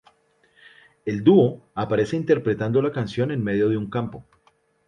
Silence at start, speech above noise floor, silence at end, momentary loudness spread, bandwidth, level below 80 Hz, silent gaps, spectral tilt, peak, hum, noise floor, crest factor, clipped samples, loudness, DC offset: 1.05 s; 42 dB; 0.65 s; 13 LU; 9.6 kHz; -56 dBFS; none; -8.5 dB/octave; -4 dBFS; none; -63 dBFS; 20 dB; under 0.1%; -22 LUFS; under 0.1%